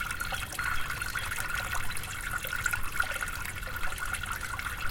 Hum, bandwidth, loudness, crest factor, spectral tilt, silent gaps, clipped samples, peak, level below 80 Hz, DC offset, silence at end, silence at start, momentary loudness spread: none; 17 kHz; -33 LUFS; 20 dB; -2 dB/octave; none; under 0.1%; -12 dBFS; -42 dBFS; under 0.1%; 0 s; 0 s; 4 LU